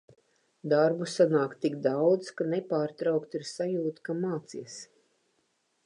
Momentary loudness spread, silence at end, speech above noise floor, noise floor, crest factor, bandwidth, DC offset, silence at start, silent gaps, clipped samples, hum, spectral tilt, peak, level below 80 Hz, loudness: 15 LU; 1 s; 46 dB; -74 dBFS; 18 dB; 11 kHz; under 0.1%; 0.65 s; none; under 0.1%; none; -6 dB/octave; -12 dBFS; -84 dBFS; -29 LUFS